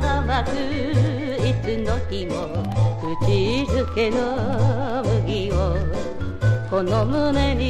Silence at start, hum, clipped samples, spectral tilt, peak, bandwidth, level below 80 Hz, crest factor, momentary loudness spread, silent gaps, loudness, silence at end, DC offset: 0 s; none; under 0.1%; -7 dB/octave; -8 dBFS; 10 kHz; -30 dBFS; 14 dB; 5 LU; none; -22 LUFS; 0 s; under 0.1%